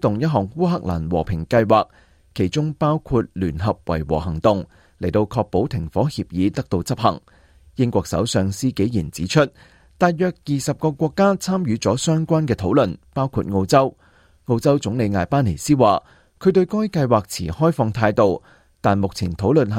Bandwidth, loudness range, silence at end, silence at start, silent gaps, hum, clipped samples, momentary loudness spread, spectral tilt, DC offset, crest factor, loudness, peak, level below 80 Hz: 16 kHz; 3 LU; 0 s; 0.05 s; none; none; under 0.1%; 7 LU; -6.5 dB/octave; under 0.1%; 18 dB; -20 LUFS; -2 dBFS; -44 dBFS